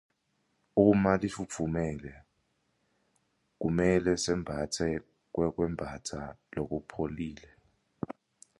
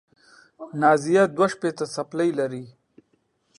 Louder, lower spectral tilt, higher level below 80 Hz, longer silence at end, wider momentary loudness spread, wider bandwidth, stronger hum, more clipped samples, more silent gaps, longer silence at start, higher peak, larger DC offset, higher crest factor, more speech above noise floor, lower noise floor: second, -31 LUFS vs -22 LUFS; about the same, -6 dB/octave vs -5.5 dB/octave; first, -52 dBFS vs -70 dBFS; second, 0.45 s vs 0.9 s; about the same, 16 LU vs 16 LU; about the same, 11.5 kHz vs 11.5 kHz; neither; neither; neither; first, 0.75 s vs 0.6 s; second, -10 dBFS vs -4 dBFS; neither; about the same, 22 dB vs 20 dB; about the same, 46 dB vs 46 dB; first, -76 dBFS vs -69 dBFS